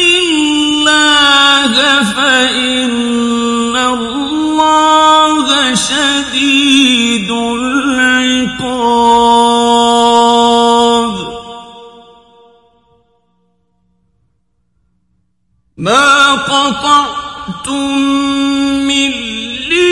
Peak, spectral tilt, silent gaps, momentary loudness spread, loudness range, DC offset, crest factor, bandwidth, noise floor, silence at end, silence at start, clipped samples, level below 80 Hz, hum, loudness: 0 dBFS; -2 dB/octave; none; 10 LU; 5 LU; under 0.1%; 12 dB; 11.5 kHz; -63 dBFS; 0 s; 0 s; under 0.1%; -44 dBFS; none; -9 LUFS